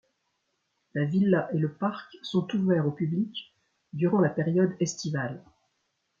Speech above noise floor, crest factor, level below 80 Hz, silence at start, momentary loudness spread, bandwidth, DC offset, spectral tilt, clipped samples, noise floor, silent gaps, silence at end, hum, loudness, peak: 50 dB; 18 dB; -70 dBFS; 0.95 s; 12 LU; 7.4 kHz; under 0.1%; -6.5 dB/octave; under 0.1%; -77 dBFS; none; 0.8 s; none; -28 LUFS; -10 dBFS